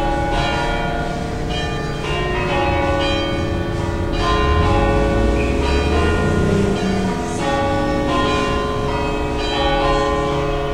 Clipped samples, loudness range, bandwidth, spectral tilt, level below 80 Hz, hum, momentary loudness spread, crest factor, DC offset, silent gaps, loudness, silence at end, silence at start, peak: under 0.1%; 3 LU; 15.5 kHz; -6 dB/octave; -24 dBFS; none; 5 LU; 14 dB; 1%; none; -19 LUFS; 0 s; 0 s; -2 dBFS